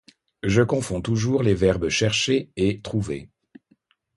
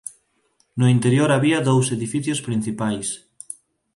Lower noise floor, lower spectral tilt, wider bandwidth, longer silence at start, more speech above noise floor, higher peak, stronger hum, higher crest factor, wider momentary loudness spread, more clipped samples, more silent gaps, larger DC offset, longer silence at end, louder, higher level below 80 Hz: about the same, -64 dBFS vs -65 dBFS; about the same, -5 dB/octave vs -5.5 dB/octave; about the same, 11.5 kHz vs 11.5 kHz; first, 0.45 s vs 0.05 s; second, 42 dB vs 46 dB; about the same, -4 dBFS vs -6 dBFS; neither; about the same, 20 dB vs 16 dB; second, 8 LU vs 20 LU; neither; neither; neither; first, 0.9 s vs 0.45 s; second, -23 LUFS vs -20 LUFS; first, -44 dBFS vs -60 dBFS